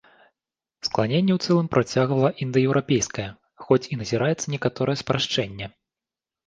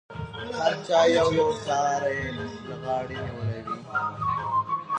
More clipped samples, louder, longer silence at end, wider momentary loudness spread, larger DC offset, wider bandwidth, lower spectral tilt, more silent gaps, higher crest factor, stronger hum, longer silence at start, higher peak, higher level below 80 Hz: neither; first, -23 LUFS vs -26 LUFS; first, 0.8 s vs 0 s; second, 10 LU vs 14 LU; neither; about the same, 10 kHz vs 9.8 kHz; about the same, -5.5 dB/octave vs -5 dB/octave; neither; about the same, 20 dB vs 16 dB; neither; first, 0.85 s vs 0.1 s; first, -4 dBFS vs -10 dBFS; about the same, -56 dBFS vs -52 dBFS